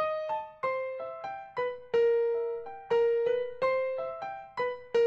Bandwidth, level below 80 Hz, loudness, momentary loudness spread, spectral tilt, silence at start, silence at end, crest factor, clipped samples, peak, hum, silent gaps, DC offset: 6.6 kHz; -70 dBFS; -31 LUFS; 12 LU; -4.5 dB/octave; 0 s; 0 s; 12 dB; under 0.1%; -18 dBFS; none; none; under 0.1%